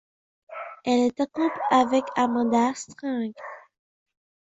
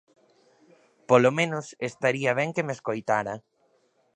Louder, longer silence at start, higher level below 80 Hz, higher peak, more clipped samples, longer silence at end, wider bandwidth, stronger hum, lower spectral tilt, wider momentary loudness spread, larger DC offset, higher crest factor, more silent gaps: about the same, -24 LUFS vs -25 LUFS; second, 0.5 s vs 1.1 s; about the same, -70 dBFS vs -72 dBFS; about the same, -6 dBFS vs -4 dBFS; neither; about the same, 0.85 s vs 0.75 s; second, 8 kHz vs 9.8 kHz; neither; about the same, -4.5 dB/octave vs -5.5 dB/octave; first, 17 LU vs 13 LU; neither; about the same, 18 dB vs 22 dB; neither